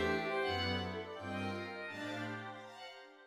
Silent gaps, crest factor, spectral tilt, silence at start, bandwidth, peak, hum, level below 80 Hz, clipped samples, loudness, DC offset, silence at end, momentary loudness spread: none; 16 dB; -5.5 dB/octave; 0 s; 15 kHz; -24 dBFS; none; -64 dBFS; under 0.1%; -40 LUFS; under 0.1%; 0 s; 14 LU